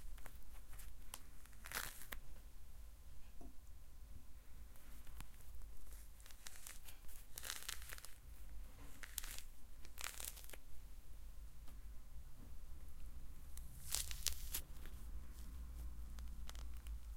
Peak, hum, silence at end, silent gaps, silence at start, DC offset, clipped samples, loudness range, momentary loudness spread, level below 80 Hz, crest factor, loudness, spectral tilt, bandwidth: -14 dBFS; none; 0 s; none; 0 s; under 0.1%; under 0.1%; 12 LU; 15 LU; -54 dBFS; 34 dB; -53 LUFS; -1.5 dB/octave; 17 kHz